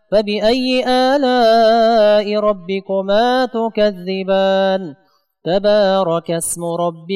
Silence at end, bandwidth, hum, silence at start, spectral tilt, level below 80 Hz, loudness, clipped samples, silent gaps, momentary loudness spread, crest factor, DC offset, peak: 0 s; 15.5 kHz; none; 0.1 s; -4.5 dB/octave; -46 dBFS; -15 LUFS; under 0.1%; none; 9 LU; 10 dB; under 0.1%; -6 dBFS